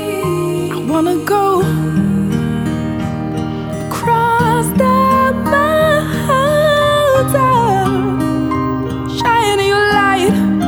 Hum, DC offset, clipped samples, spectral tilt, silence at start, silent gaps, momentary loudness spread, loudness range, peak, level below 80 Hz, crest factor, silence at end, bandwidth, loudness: none; under 0.1%; under 0.1%; -6 dB/octave; 0 s; none; 8 LU; 4 LU; 0 dBFS; -36 dBFS; 14 dB; 0 s; over 20 kHz; -14 LUFS